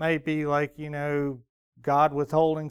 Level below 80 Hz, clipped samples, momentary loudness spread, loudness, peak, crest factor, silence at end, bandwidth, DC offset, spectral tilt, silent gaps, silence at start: -58 dBFS; under 0.1%; 10 LU; -26 LUFS; -10 dBFS; 16 dB; 0 s; 14.5 kHz; under 0.1%; -7.5 dB/octave; 1.49-1.72 s; 0 s